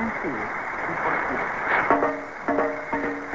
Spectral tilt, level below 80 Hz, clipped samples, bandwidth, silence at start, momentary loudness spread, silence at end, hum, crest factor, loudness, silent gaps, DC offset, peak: -6 dB/octave; -54 dBFS; under 0.1%; 7.8 kHz; 0 s; 7 LU; 0 s; none; 22 dB; -25 LUFS; none; 0.3%; -4 dBFS